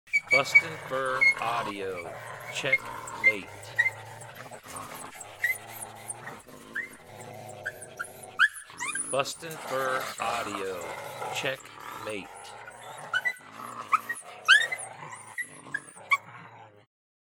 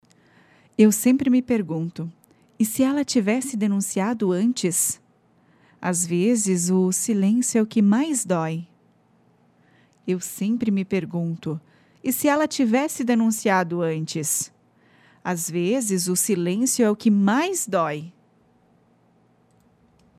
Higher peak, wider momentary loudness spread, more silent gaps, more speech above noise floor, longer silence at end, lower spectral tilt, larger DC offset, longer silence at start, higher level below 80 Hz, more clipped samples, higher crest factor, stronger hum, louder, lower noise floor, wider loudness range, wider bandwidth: about the same, -6 dBFS vs -6 dBFS; first, 21 LU vs 11 LU; neither; second, 21 dB vs 39 dB; second, 0.65 s vs 2.1 s; second, -1.5 dB/octave vs -5 dB/octave; neither; second, 0.05 s vs 0.8 s; about the same, -70 dBFS vs -68 dBFS; neither; first, 24 dB vs 18 dB; neither; second, -28 LUFS vs -22 LUFS; second, -50 dBFS vs -60 dBFS; first, 9 LU vs 4 LU; first, 19 kHz vs 16 kHz